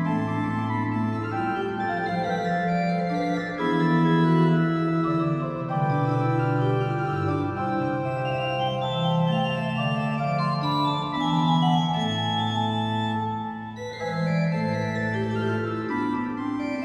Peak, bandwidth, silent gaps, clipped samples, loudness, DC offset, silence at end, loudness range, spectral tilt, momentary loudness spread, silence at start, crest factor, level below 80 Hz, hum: -10 dBFS; 8.4 kHz; none; under 0.1%; -25 LUFS; under 0.1%; 0 s; 4 LU; -7.5 dB/octave; 6 LU; 0 s; 14 dB; -56 dBFS; none